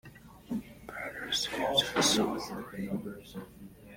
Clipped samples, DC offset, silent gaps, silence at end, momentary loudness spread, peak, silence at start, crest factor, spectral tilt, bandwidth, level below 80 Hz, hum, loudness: under 0.1%; under 0.1%; none; 0 s; 20 LU; -12 dBFS; 0.05 s; 22 dB; -2.5 dB/octave; 16.5 kHz; -60 dBFS; none; -31 LUFS